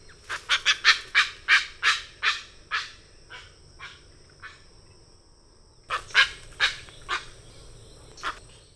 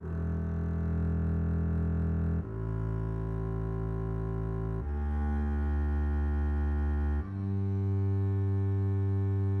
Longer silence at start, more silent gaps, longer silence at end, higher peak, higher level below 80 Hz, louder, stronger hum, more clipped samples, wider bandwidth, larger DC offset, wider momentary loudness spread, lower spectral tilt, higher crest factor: first, 0.3 s vs 0 s; neither; first, 0.35 s vs 0 s; first, -2 dBFS vs -22 dBFS; second, -54 dBFS vs -34 dBFS; first, -24 LUFS vs -32 LUFS; neither; neither; first, 11 kHz vs 3.3 kHz; neither; first, 25 LU vs 4 LU; second, 1 dB/octave vs -11 dB/octave; first, 28 dB vs 8 dB